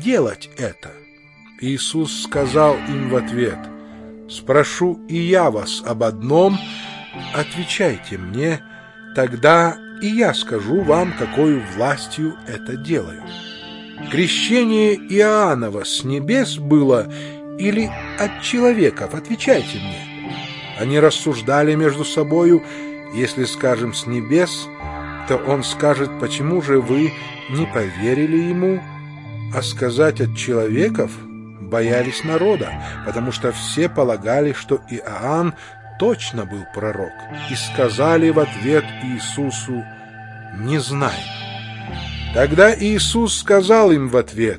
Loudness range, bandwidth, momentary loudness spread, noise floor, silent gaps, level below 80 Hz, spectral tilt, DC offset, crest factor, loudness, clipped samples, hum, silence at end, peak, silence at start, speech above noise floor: 4 LU; 11.5 kHz; 15 LU; -46 dBFS; none; -44 dBFS; -5 dB/octave; under 0.1%; 18 dB; -18 LUFS; under 0.1%; none; 0 s; 0 dBFS; 0 s; 28 dB